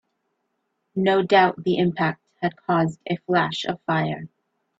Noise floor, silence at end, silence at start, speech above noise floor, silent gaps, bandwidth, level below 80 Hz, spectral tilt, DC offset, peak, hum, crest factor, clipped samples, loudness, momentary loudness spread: -75 dBFS; 0.5 s; 0.95 s; 53 dB; none; 8 kHz; -64 dBFS; -6.5 dB/octave; under 0.1%; -4 dBFS; none; 20 dB; under 0.1%; -22 LUFS; 11 LU